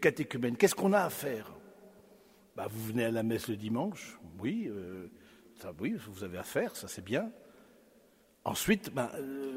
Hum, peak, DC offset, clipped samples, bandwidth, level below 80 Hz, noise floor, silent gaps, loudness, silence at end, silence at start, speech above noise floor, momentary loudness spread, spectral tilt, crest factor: none; -10 dBFS; under 0.1%; under 0.1%; 16 kHz; -66 dBFS; -65 dBFS; none; -34 LUFS; 0 s; 0 s; 31 dB; 18 LU; -5 dB/octave; 24 dB